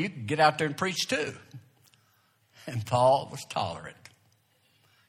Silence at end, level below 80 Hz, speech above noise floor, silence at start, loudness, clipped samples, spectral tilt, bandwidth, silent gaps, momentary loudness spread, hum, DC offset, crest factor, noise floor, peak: 1.15 s; -68 dBFS; 40 dB; 0 s; -28 LUFS; under 0.1%; -4.5 dB/octave; 16 kHz; none; 19 LU; none; under 0.1%; 22 dB; -67 dBFS; -8 dBFS